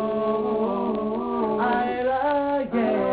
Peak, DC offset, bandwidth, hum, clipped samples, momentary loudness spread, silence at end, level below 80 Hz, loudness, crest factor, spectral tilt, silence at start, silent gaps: -12 dBFS; under 0.1%; 4 kHz; none; under 0.1%; 3 LU; 0 s; -54 dBFS; -24 LUFS; 12 dB; -10 dB/octave; 0 s; none